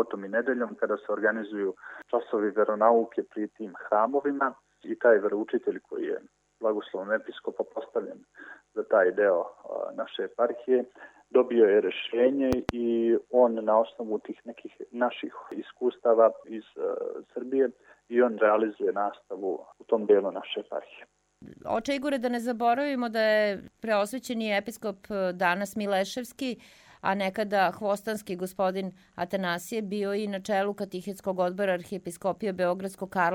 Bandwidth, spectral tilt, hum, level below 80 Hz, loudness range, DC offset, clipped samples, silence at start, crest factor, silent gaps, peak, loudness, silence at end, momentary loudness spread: 16.5 kHz; -5.5 dB/octave; none; -64 dBFS; 5 LU; under 0.1%; under 0.1%; 0 s; 22 dB; none; -6 dBFS; -28 LUFS; 0 s; 14 LU